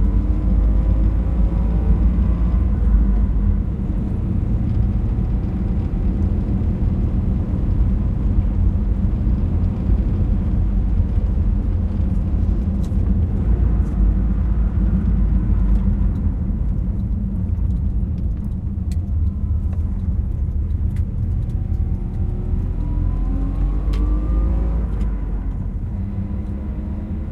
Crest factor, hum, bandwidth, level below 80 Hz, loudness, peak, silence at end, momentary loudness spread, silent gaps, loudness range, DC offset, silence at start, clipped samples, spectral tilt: 14 dB; none; 3 kHz; -20 dBFS; -21 LUFS; -4 dBFS; 0 s; 5 LU; none; 3 LU; under 0.1%; 0 s; under 0.1%; -10.5 dB/octave